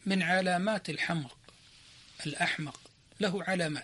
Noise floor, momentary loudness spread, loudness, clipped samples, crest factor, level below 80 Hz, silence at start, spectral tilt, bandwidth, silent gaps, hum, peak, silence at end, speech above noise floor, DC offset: -57 dBFS; 16 LU; -32 LUFS; under 0.1%; 18 dB; -70 dBFS; 0.05 s; -5 dB/octave; 11.5 kHz; none; none; -16 dBFS; 0 s; 26 dB; under 0.1%